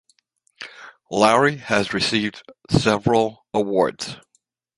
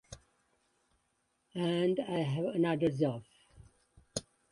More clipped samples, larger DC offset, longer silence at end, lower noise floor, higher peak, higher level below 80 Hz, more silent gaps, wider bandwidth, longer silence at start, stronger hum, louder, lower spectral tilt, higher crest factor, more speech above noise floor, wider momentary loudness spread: neither; neither; first, 0.65 s vs 0.3 s; second, -67 dBFS vs -78 dBFS; first, -2 dBFS vs -18 dBFS; first, -52 dBFS vs -66 dBFS; neither; about the same, 11.5 kHz vs 11.5 kHz; first, 0.6 s vs 0.1 s; neither; first, -20 LUFS vs -33 LUFS; about the same, -5 dB/octave vs -6 dB/octave; about the same, 20 dB vs 18 dB; about the same, 47 dB vs 46 dB; first, 20 LU vs 15 LU